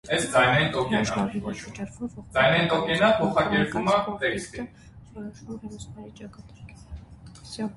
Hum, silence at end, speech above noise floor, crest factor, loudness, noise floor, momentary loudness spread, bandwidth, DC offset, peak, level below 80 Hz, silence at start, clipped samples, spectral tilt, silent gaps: none; 0.05 s; 20 dB; 20 dB; -24 LUFS; -46 dBFS; 23 LU; 11.5 kHz; under 0.1%; -6 dBFS; -50 dBFS; 0.05 s; under 0.1%; -5 dB/octave; none